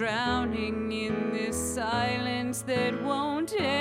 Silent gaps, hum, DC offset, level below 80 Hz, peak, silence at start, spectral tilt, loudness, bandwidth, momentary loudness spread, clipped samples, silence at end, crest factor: none; none; under 0.1%; -52 dBFS; -16 dBFS; 0 s; -4 dB/octave; -29 LUFS; 16.5 kHz; 3 LU; under 0.1%; 0 s; 14 dB